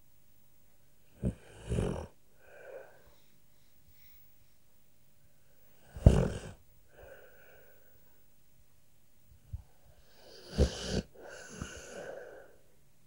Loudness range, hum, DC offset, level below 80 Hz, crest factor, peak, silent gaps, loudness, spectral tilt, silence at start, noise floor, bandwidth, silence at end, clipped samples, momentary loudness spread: 22 LU; none; 0.1%; -42 dBFS; 32 dB; -4 dBFS; none; -34 LUFS; -6.5 dB/octave; 1.2 s; -69 dBFS; 16 kHz; 0.65 s; under 0.1%; 28 LU